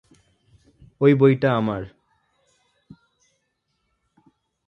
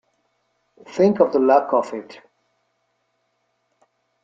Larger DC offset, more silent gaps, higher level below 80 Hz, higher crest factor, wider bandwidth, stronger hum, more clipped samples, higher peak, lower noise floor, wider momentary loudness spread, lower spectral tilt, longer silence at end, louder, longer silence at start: neither; neither; first, -58 dBFS vs -70 dBFS; about the same, 22 dB vs 20 dB; second, 5.8 kHz vs 7.6 kHz; neither; neither; about the same, -4 dBFS vs -2 dBFS; about the same, -74 dBFS vs -71 dBFS; about the same, 16 LU vs 18 LU; first, -9.5 dB/octave vs -7.5 dB/octave; first, 2.8 s vs 2.1 s; about the same, -19 LUFS vs -18 LUFS; about the same, 1 s vs 0.9 s